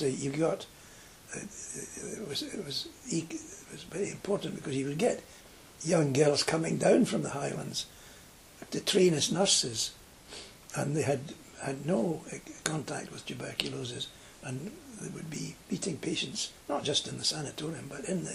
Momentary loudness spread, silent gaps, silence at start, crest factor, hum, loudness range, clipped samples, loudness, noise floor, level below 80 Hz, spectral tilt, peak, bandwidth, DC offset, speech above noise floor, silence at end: 19 LU; none; 0 s; 26 dB; none; 8 LU; under 0.1%; -32 LUFS; -54 dBFS; -64 dBFS; -4 dB/octave; -6 dBFS; 15.5 kHz; under 0.1%; 21 dB; 0 s